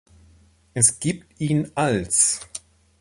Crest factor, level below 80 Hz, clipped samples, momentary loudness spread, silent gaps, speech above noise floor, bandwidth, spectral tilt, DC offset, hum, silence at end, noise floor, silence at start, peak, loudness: 22 dB; -52 dBFS; under 0.1%; 15 LU; none; 33 dB; 12 kHz; -3.5 dB/octave; under 0.1%; none; 0.4 s; -55 dBFS; 0.75 s; -2 dBFS; -20 LUFS